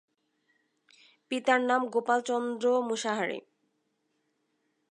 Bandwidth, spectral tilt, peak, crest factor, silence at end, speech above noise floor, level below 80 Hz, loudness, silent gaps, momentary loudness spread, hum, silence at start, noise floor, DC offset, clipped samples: 11 kHz; -3 dB/octave; -10 dBFS; 22 dB; 1.55 s; 49 dB; -90 dBFS; -29 LUFS; none; 8 LU; none; 1.3 s; -77 dBFS; under 0.1%; under 0.1%